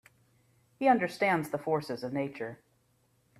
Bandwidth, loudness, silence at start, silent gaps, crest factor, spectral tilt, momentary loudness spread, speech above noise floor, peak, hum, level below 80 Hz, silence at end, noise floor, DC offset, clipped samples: 14.5 kHz; -30 LUFS; 0.8 s; none; 22 dB; -6 dB/octave; 11 LU; 40 dB; -12 dBFS; none; -74 dBFS; 0.85 s; -70 dBFS; under 0.1%; under 0.1%